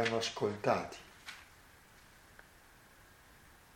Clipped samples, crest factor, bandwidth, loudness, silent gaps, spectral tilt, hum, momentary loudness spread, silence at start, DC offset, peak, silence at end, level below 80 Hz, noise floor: under 0.1%; 24 dB; 17 kHz; -37 LUFS; none; -4 dB/octave; none; 26 LU; 0 s; under 0.1%; -16 dBFS; 1.35 s; -68 dBFS; -61 dBFS